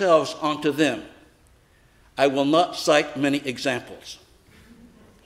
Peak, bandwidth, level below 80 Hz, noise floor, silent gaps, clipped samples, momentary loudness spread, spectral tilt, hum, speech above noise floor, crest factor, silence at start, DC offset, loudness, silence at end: -4 dBFS; 16 kHz; -60 dBFS; -57 dBFS; none; under 0.1%; 19 LU; -4.5 dB/octave; none; 35 dB; 20 dB; 0 s; under 0.1%; -22 LUFS; 1.1 s